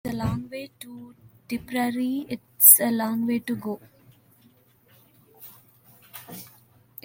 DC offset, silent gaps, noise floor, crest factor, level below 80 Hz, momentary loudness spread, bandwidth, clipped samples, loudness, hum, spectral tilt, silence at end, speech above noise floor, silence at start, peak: under 0.1%; none; -59 dBFS; 26 dB; -56 dBFS; 29 LU; 17 kHz; under 0.1%; -20 LUFS; none; -3.5 dB/octave; 0.6 s; 36 dB; 0.05 s; 0 dBFS